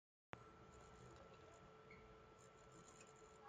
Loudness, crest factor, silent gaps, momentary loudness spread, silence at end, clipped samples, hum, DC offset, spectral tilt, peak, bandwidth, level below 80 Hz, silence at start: -64 LUFS; 34 dB; none; 4 LU; 0 s; under 0.1%; none; under 0.1%; -4.5 dB/octave; -30 dBFS; 9 kHz; -76 dBFS; 0.35 s